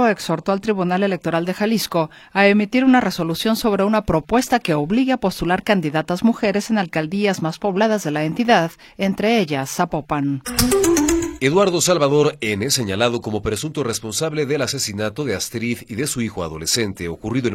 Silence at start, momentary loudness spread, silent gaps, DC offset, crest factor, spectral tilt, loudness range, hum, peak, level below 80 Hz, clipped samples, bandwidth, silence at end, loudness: 0 s; 8 LU; none; under 0.1%; 18 dB; -4.5 dB/octave; 4 LU; none; -2 dBFS; -42 dBFS; under 0.1%; 16.5 kHz; 0 s; -19 LUFS